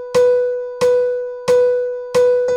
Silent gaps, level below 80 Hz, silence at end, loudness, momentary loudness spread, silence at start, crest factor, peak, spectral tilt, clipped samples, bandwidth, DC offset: none; -58 dBFS; 0 s; -16 LUFS; 6 LU; 0 s; 10 dB; -4 dBFS; -4 dB/octave; under 0.1%; 11.5 kHz; under 0.1%